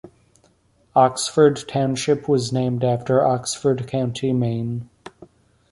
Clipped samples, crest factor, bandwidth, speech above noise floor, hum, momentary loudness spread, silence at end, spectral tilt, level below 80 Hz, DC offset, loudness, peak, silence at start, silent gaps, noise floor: under 0.1%; 18 dB; 11.5 kHz; 40 dB; none; 7 LU; 0.45 s; -5.5 dB/octave; -56 dBFS; under 0.1%; -20 LUFS; -4 dBFS; 0.05 s; none; -60 dBFS